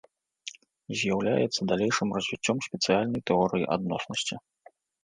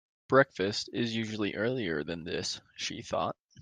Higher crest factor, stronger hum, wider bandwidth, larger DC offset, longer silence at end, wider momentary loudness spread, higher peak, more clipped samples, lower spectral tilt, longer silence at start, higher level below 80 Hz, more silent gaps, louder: about the same, 20 dB vs 22 dB; neither; about the same, 10 kHz vs 10 kHz; neither; first, 0.65 s vs 0 s; first, 16 LU vs 11 LU; about the same, -10 dBFS vs -10 dBFS; neither; about the same, -4.5 dB/octave vs -4.5 dB/octave; first, 0.45 s vs 0.3 s; first, -62 dBFS vs -68 dBFS; second, none vs 3.40-3.49 s; first, -28 LUFS vs -31 LUFS